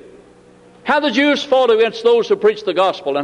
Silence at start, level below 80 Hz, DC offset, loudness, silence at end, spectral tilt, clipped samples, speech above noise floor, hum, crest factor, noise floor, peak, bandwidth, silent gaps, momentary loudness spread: 0.85 s; -62 dBFS; under 0.1%; -15 LUFS; 0 s; -4 dB/octave; under 0.1%; 31 dB; none; 12 dB; -46 dBFS; -4 dBFS; 10 kHz; none; 3 LU